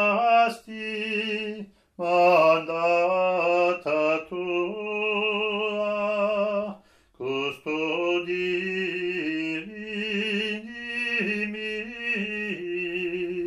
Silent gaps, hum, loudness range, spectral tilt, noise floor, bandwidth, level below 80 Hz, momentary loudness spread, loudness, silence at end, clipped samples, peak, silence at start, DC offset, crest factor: none; none; 5 LU; -5.5 dB/octave; -47 dBFS; 12.5 kHz; -66 dBFS; 10 LU; -25 LUFS; 0 s; under 0.1%; -8 dBFS; 0 s; under 0.1%; 18 dB